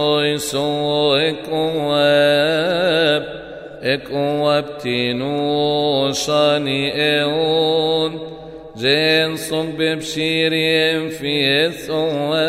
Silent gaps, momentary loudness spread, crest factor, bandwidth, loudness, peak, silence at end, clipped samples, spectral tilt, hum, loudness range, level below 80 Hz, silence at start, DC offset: none; 7 LU; 16 dB; 15.5 kHz; -17 LUFS; -2 dBFS; 0 s; under 0.1%; -4.5 dB/octave; none; 2 LU; -52 dBFS; 0 s; under 0.1%